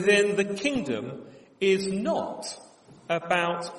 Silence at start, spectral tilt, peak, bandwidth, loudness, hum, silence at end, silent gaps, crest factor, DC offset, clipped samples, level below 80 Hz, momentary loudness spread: 0 s; -4.5 dB/octave; -8 dBFS; 11.5 kHz; -27 LUFS; none; 0 s; none; 18 dB; under 0.1%; under 0.1%; -66 dBFS; 15 LU